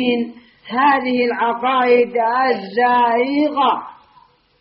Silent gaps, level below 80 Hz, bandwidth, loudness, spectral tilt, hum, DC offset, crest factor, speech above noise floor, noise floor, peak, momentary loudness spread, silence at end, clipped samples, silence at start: none; -64 dBFS; 5.6 kHz; -16 LUFS; -1.5 dB/octave; none; under 0.1%; 14 dB; 36 dB; -52 dBFS; -4 dBFS; 6 LU; 0.7 s; under 0.1%; 0 s